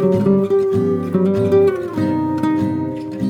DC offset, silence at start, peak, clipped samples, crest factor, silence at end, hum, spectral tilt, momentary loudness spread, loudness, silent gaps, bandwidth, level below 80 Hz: under 0.1%; 0 s; -4 dBFS; under 0.1%; 12 dB; 0 s; none; -9 dB/octave; 6 LU; -17 LUFS; none; 9.8 kHz; -54 dBFS